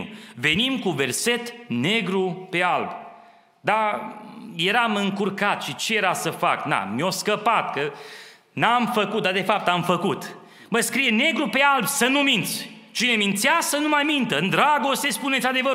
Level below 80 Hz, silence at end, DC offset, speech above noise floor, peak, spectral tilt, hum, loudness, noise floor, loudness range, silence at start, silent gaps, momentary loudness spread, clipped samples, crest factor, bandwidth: -66 dBFS; 0 s; under 0.1%; 29 dB; -2 dBFS; -3 dB/octave; none; -22 LUFS; -51 dBFS; 4 LU; 0 s; none; 11 LU; under 0.1%; 20 dB; 16 kHz